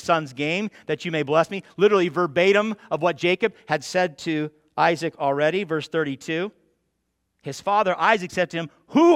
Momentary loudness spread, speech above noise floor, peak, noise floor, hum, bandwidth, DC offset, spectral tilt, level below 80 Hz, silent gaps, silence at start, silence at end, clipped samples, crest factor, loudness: 9 LU; 53 dB; -4 dBFS; -75 dBFS; none; 13 kHz; under 0.1%; -5.5 dB/octave; -68 dBFS; none; 0 s; 0 s; under 0.1%; 20 dB; -23 LUFS